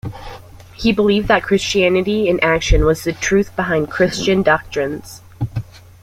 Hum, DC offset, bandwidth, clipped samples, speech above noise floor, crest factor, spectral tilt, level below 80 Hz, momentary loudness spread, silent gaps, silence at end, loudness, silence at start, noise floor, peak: none; under 0.1%; 16 kHz; under 0.1%; 21 dB; 16 dB; -5 dB/octave; -28 dBFS; 14 LU; none; 0.25 s; -16 LUFS; 0.05 s; -37 dBFS; -2 dBFS